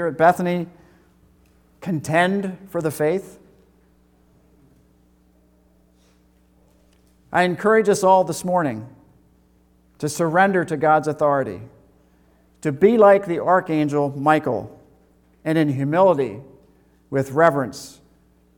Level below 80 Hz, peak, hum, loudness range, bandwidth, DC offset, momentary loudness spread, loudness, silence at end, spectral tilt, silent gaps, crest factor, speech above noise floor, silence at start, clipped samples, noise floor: -60 dBFS; -2 dBFS; none; 6 LU; 19 kHz; under 0.1%; 14 LU; -19 LUFS; 0.65 s; -6 dB/octave; none; 20 dB; 39 dB; 0 s; under 0.1%; -57 dBFS